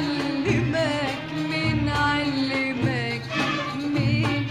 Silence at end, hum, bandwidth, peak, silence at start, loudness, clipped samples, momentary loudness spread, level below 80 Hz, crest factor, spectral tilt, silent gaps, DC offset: 0 s; none; 12.5 kHz; -8 dBFS; 0 s; -24 LUFS; under 0.1%; 4 LU; -44 dBFS; 16 dB; -6 dB/octave; none; under 0.1%